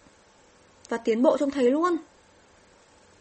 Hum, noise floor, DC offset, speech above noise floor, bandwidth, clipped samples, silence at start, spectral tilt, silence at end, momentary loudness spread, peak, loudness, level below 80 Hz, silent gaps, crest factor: none; -57 dBFS; under 0.1%; 34 dB; 8.4 kHz; under 0.1%; 0.9 s; -5 dB/octave; 1.2 s; 9 LU; -8 dBFS; -24 LUFS; -66 dBFS; none; 20 dB